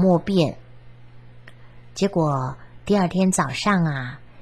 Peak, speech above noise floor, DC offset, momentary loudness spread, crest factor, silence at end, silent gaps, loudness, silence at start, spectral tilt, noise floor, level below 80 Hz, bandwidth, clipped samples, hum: -6 dBFS; 25 dB; 0.5%; 16 LU; 18 dB; 0.25 s; none; -22 LUFS; 0 s; -6 dB/octave; -45 dBFS; -52 dBFS; 12.5 kHz; under 0.1%; none